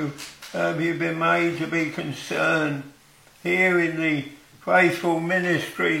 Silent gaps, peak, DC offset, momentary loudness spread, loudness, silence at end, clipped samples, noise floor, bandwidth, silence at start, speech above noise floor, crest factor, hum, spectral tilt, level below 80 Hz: none; -6 dBFS; under 0.1%; 13 LU; -23 LUFS; 0 s; under 0.1%; -52 dBFS; 16.5 kHz; 0 s; 29 dB; 18 dB; none; -5.5 dB/octave; -66 dBFS